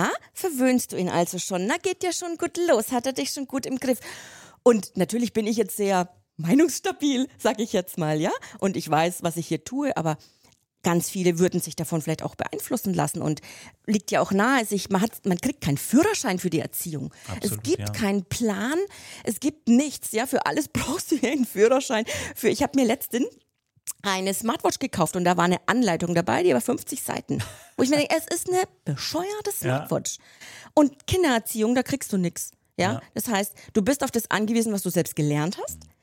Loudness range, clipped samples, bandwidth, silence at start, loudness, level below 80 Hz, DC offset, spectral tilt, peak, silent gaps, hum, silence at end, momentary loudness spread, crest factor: 3 LU; under 0.1%; 17 kHz; 0 s; -25 LUFS; -56 dBFS; under 0.1%; -4.5 dB/octave; -4 dBFS; none; none; 0.15 s; 8 LU; 20 dB